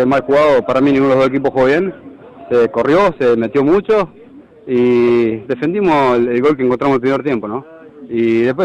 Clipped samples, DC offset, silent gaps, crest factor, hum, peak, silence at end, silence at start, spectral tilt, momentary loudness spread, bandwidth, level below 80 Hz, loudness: under 0.1%; under 0.1%; none; 8 dB; none; -6 dBFS; 0 s; 0 s; -7.5 dB/octave; 7 LU; 8.6 kHz; -48 dBFS; -14 LUFS